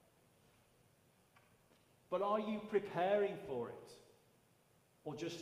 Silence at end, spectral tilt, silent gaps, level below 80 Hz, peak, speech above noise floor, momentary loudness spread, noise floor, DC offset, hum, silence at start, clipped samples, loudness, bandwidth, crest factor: 0 s; -6 dB/octave; none; -82 dBFS; -22 dBFS; 33 dB; 16 LU; -73 dBFS; under 0.1%; none; 2.1 s; under 0.1%; -40 LUFS; 15.5 kHz; 22 dB